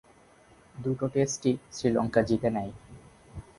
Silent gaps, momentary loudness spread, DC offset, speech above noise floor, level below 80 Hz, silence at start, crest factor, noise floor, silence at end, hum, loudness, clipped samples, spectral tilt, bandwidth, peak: none; 22 LU; under 0.1%; 30 dB; -54 dBFS; 0.75 s; 20 dB; -58 dBFS; 0.2 s; none; -28 LUFS; under 0.1%; -6 dB/octave; 11.5 kHz; -10 dBFS